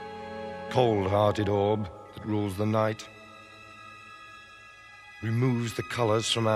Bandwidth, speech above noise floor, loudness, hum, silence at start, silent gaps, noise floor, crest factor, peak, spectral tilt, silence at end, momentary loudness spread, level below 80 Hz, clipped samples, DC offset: 14 kHz; 24 dB; -28 LUFS; none; 0 s; none; -50 dBFS; 20 dB; -8 dBFS; -5.5 dB/octave; 0 s; 22 LU; -62 dBFS; under 0.1%; under 0.1%